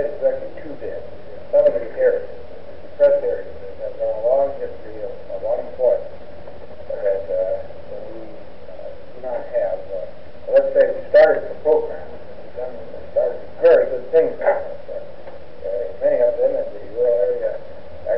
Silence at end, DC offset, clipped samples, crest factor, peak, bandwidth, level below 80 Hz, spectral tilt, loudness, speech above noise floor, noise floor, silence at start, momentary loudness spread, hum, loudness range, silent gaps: 0 s; 4%; under 0.1%; 16 dB; -6 dBFS; 5.6 kHz; -52 dBFS; -4 dB/octave; -20 LUFS; 19 dB; -39 dBFS; 0 s; 22 LU; none; 7 LU; none